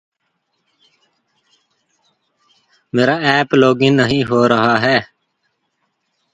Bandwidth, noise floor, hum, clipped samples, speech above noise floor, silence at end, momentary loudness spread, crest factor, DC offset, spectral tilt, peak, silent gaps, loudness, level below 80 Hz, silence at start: 9.4 kHz; -69 dBFS; none; under 0.1%; 56 dB; 1.3 s; 4 LU; 18 dB; under 0.1%; -6 dB/octave; 0 dBFS; none; -14 LUFS; -54 dBFS; 2.95 s